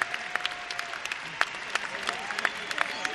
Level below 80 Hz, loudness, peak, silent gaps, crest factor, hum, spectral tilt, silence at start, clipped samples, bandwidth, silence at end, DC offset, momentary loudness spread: -68 dBFS; -31 LUFS; -4 dBFS; none; 28 dB; none; -0.5 dB/octave; 0 s; under 0.1%; 12 kHz; 0 s; under 0.1%; 4 LU